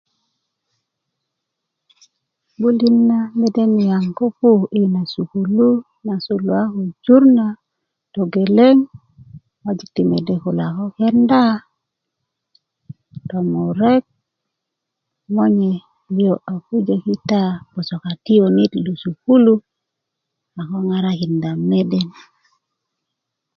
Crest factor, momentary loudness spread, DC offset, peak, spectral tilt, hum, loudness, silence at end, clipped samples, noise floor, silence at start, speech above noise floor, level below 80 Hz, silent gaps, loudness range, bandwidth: 18 dB; 13 LU; under 0.1%; 0 dBFS; -8.5 dB/octave; none; -17 LUFS; 1.45 s; under 0.1%; -80 dBFS; 2.6 s; 64 dB; -60 dBFS; none; 6 LU; 6.6 kHz